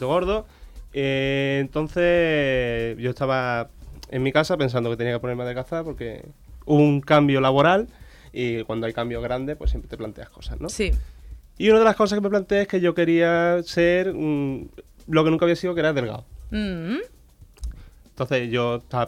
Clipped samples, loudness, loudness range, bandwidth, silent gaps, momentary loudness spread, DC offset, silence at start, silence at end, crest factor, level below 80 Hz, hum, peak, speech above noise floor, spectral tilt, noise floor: under 0.1%; -22 LUFS; 7 LU; 15.5 kHz; none; 17 LU; under 0.1%; 0 s; 0 s; 16 dB; -38 dBFS; none; -6 dBFS; 28 dB; -6.5 dB/octave; -50 dBFS